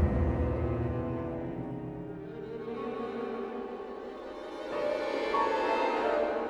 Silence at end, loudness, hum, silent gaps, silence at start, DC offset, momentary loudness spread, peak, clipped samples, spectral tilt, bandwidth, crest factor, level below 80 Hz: 0 s; -33 LUFS; none; none; 0 s; under 0.1%; 13 LU; -14 dBFS; under 0.1%; -7.5 dB/octave; 9.6 kHz; 18 dB; -42 dBFS